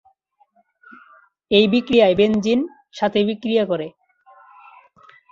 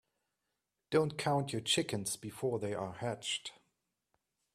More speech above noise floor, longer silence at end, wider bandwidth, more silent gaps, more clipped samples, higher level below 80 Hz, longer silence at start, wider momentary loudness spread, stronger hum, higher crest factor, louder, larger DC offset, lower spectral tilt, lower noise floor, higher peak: second, 44 dB vs 51 dB; first, 1.45 s vs 1.05 s; second, 7.4 kHz vs 15 kHz; neither; neither; first, -56 dBFS vs -72 dBFS; first, 1.5 s vs 0.9 s; first, 10 LU vs 7 LU; neither; about the same, 20 dB vs 20 dB; first, -18 LUFS vs -35 LUFS; neither; first, -6 dB/octave vs -4 dB/octave; second, -61 dBFS vs -87 dBFS; first, -2 dBFS vs -18 dBFS